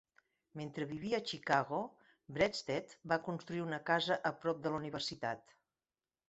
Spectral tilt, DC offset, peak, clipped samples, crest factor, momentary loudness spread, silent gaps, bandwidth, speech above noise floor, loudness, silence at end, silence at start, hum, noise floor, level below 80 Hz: -3 dB/octave; under 0.1%; -16 dBFS; under 0.1%; 22 dB; 12 LU; none; 8 kHz; over 52 dB; -38 LUFS; 0.9 s; 0.55 s; none; under -90 dBFS; -72 dBFS